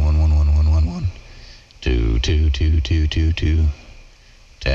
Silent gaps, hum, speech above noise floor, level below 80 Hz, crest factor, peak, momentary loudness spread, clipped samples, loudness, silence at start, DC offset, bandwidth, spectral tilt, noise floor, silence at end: none; none; 29 dB; -20 dBFS; 10 dB; -8 dBFS; 11 LU; under 0.1%; -19 LUFS; 0 s; under 0.1%; 7 kHz; -6.5 dB/octave; -46 dBFS; 0 s